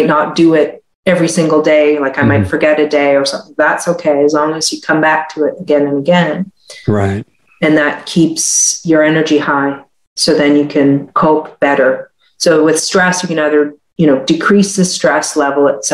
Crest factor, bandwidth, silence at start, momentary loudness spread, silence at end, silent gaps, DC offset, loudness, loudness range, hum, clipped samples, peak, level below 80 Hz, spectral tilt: 12 dB; 15 kHz; 0 s; 7 LU; 0 s; 0.95-1.03 s, 10.07-10.16 s; under 0.1%; -12 LUFS; 2 LU; none; under 0.1%; 0 dBFS; -50 dBFS; -4 dB/octave